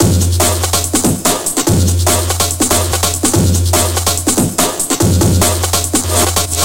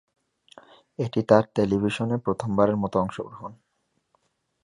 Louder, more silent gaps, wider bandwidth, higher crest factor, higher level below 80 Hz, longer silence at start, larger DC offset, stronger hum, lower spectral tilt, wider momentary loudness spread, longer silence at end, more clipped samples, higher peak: first, -12 LUFS vs -24 LUFS; neither; first, 17.5 kHz vs 11 kHz; second, 12 dB vs 22 dB; first, -26 dBFS vs -56 dBFS; second, 0 s vs 1 s; first, 2% vs under 0.1%; neither; second, -3.5 dB/octave vs -7.5 dB/octave; second, 2 LU vs 18 LU; second, 0 s vs 1.1 s; neither; first, 0 dBFS vs -4 dBFS